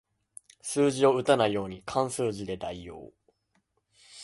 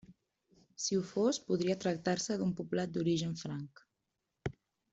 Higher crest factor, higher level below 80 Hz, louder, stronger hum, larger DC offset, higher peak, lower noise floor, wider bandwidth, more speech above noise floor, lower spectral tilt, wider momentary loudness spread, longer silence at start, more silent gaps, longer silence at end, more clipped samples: first, 22 dB vs 16 dB; first, -60 dBFS vs -66 dBFS; first, -27 LUFS vs -35 LUFS; neither; neither; first, -8 dBFS vs -20 dBFS; second, -74 dBFS vs -86 dBFS; first, 11.5 kHz vs 8.2 kHz; second, 47 dB vs 52 dB; about the same, -5 dB/octave vs -5 dB/octave; first, 18 LU vs 12 LU; first, 0.65 s vs 0.1 s; neither; second, 0 s vs 0.4 s; neither